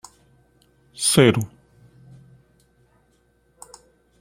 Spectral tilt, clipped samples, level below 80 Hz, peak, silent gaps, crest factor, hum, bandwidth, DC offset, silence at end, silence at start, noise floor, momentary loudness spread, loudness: -4 dB/octave; under 0.1%; -58 dBFS; -2 dBFS; none; 24 dB; none; 16 kHz; under 0.1%; 2.75 s; 1 s; -63 dBFS; 29 LU; -18 LUFS